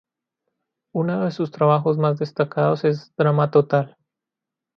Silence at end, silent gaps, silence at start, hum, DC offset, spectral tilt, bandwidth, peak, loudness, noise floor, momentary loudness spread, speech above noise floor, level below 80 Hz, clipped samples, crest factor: 0.9 s; none; 0.95 s; none; under 0.1%; -9 dB/octave; 6.2 kHz; -4 dBFS; -21 LUFS; -86 dBFS; 7 LU; 66 dB; -68 dBFS; under 0.1%; 18 dB